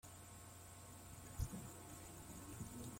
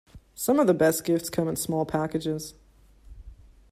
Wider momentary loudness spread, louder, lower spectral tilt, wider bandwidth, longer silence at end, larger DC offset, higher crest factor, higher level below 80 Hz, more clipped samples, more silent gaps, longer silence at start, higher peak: about the same, 8 LU vs 10 LU; second, -54 LUFS vs -26 LUFS; about the same, -4.5 dB/octave vs -5 dB/octave; about the same, 16.5 kHz vs 16 kHz; second, 0 s vs 0.35 s; neither; about the same, 20 dB vs 18 dB; second, -60 dBFS vs -52 dBFS; neither; neither; about the same, 0.05 s vs 0.15 s; second, -32 dBFS vs -8 dBFS